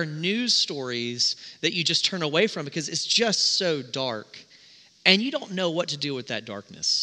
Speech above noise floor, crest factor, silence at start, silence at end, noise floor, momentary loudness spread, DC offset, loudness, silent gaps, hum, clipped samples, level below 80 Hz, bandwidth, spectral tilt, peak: 28 dB; 24 dB; 0 s; 0 s; -54 dBFS; 11 LU; under 0.1%; -24 LUFS; none; none; under 0.1%; -76 dBFS; 11 kHz; -2.5 dB/octave; -2 dBFS